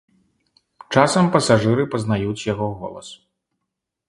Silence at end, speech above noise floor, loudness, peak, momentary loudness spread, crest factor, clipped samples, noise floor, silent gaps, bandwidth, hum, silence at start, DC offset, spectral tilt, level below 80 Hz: 0.95 s; 62 dB; -19 LUFS; 0 dBFS; 17 LU; 22 dB; under 0.1%; -80 dBFS; none; 11.5 kHz; none; 0.9 s; under 0.1%; -5.5 dB/octave; -52 dBFS